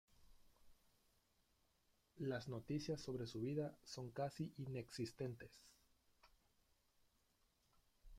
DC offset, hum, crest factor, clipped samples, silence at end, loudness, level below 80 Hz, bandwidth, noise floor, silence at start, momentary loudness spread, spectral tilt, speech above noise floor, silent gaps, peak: under 0.1%; none; 18 dB; under 0.1%; 0 s; -48 LUFS; -74 dBFS; 16 kHz; -81 dBFS; 0.2 s; 7 LU; -6 dB/octave; 33 dB; none; -32 dBFS